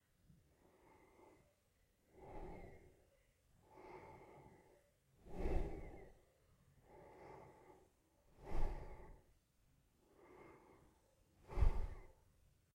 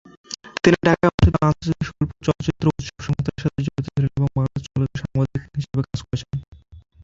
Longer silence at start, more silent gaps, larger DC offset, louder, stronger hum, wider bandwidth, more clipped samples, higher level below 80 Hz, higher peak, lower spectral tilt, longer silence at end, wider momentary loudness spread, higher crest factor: first, 2.15 s vs 0.3 s; second, none vs 1.14-1.18 s, 6.48-6.52 s; neither; second, -50 LUFS vs -22 LUFS; neither; second, 6 kHz vs 7.8 kHz; neither; second, -50 dBFS vs -34 dBFS; second, -24 dBFS vs -2 dBFS; about the same, -8 dB/octave vs -7 dB/octave; first, 0.65 s vs 0.25 s; first, 24 LU vs 12 LU; about the same, 24 dB vs 20 dB